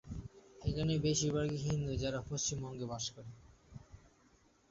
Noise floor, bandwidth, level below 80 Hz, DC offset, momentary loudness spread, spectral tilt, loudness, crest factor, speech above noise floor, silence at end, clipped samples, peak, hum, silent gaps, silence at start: -68 dBFS; 8 kHz; -54 dBFS; under 0.1%; 22 LU; -6 dB/octave; -37 LUFS; 16 dB; 32 dB; 0.75 s; under 0.1%; -22 dBFS; none; none; 0.05 s